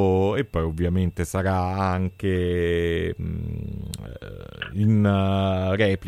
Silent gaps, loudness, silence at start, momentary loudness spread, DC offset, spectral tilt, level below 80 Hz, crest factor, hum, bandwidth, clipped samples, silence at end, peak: none; -24 LUFS; 0 s; 14 LU; under 0.1%; -7 dB/octave; -40 dBFS; 16 dB; none; 14 kHz; under 0.1%; 0 s; -6 dBFS